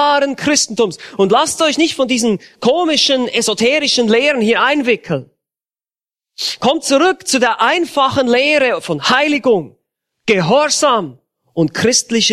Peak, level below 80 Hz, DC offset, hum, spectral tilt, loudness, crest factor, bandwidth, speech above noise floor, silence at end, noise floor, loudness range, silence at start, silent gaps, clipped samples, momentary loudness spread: 0 dBFS; -56 dBFS; under 0.1%; none; -3 dB/octave; -14 LUFS; 14 dB; 14.5 kHz; over 76 dB; 0 s; under -90 dBFS; 3 LU; 0 s; none; under 0.1%; 6 LU